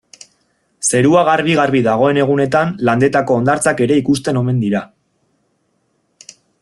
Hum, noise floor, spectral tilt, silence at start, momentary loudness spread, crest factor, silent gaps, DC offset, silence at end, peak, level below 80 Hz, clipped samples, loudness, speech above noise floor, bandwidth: none; -64 dBFS; -5.5 dB/octave; 0.8 s; 5 LU; 14 dB; none; under 0.1%; 1.75 s; 0 dBFS; -52 dBFS; under 0.1%; -14 LUFS; 50 dB; 12.5 kHz